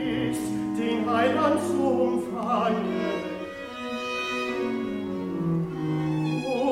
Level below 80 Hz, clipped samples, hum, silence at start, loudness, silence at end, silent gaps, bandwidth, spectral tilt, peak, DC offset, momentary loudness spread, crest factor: -58 dBFS; under 0.1%; none; 0 s; -27 LUFS; 0 s; none; 15.5 kHz; -6.5 dB/octave; -10 dBFS; under 0.1%; 8 LU; 16 dB